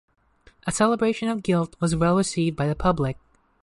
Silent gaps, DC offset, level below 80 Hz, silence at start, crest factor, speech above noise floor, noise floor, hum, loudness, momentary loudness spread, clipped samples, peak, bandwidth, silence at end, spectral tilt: none; under 0.1%; -44 dBFS; 0.65 s; 16 dB; 35 dB; -57 dBFS; none; -23 LUFS; 8 LU; under 0.1%; -8 dBFS; 11.5 kHz; 0.5 s; -6 dB/octave